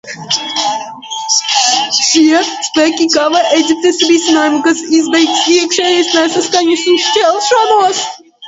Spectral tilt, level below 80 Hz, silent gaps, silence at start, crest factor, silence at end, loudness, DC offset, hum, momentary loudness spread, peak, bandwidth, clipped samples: -1 dB/octave; -60 dBFS; none; 0.05 s; 12 dB; 0 s; -10 LUFS; under 0.1%; none; 6 LU; 0 dBFS; 8 kHz; under 0.1%